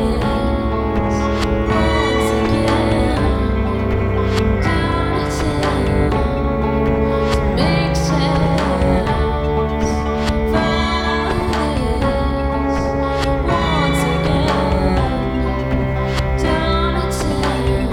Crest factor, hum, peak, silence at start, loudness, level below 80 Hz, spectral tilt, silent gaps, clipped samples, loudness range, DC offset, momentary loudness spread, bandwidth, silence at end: 14 dB; none; -2 dBFS; 0 s; -17 LUFS; -22 dBFS; -6.5 dB/octave; none; under 0.1%; 1 LU; under 0.1%; 3 LU; 13.5 kHz; 0 s